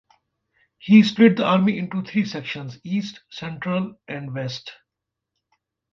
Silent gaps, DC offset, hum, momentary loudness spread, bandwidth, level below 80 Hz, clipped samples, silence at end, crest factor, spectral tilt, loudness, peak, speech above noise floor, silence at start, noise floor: none; under 0.1%; none; 19 LU; 6.8 kHz; -66 dBFS; under 0.1%; 1.2 s; 20 dB; -7 dB/octave; -21 LUFS; -2 dBFS; 63 dB; 0.85 s; -84 dBFS